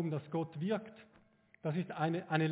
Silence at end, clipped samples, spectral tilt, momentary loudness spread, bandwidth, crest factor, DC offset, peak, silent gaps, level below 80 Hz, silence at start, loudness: 0 s; under 0.1%; -6.5 dB/octave; 7 LU; 4 kHz; 20 dB; under 0.1%; -18 dBFS; none; -80 dBFS; 0 s; -38 LUFS